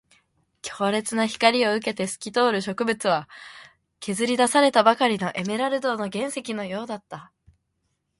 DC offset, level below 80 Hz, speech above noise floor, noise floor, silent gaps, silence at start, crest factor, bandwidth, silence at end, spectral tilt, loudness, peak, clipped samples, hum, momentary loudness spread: under 0.1%; -68 dBFS; 51 dB; -75 dBFS; none; 0.65 s; 22 dB; 11.5 kHz; 0.95 s; -3.5 dB/octave; -23 LUFS; -2 dBFS; under 0.1%; none; 18 LU